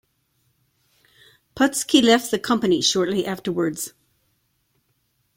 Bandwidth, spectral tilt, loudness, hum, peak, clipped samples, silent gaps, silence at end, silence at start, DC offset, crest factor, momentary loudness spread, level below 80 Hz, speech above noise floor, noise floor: 16.5 kHz; -3.5 dB/octave; -20 LUFS; none; -2 dBFS; under 0.1%; none; 1.5 s; 1.55 s; under 0.1%; 22 dB; 10 LU; -60 dBFS; 49 dB; -69 dBFS